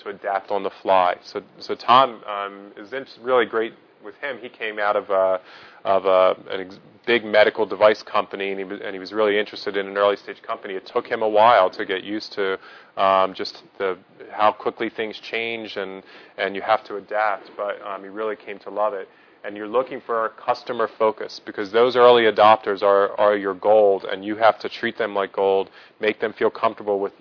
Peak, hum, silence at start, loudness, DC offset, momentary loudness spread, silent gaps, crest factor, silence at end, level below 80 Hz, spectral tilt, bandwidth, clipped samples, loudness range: -2 dBFS; none; 0.05 s; -21 LUFS; under 0.1%; 15 LU; none; 20 dB; 0.1 s; -72 dBFS; -5.5 dB/octave; 5.4 kHz; under 0.1%; 9 LU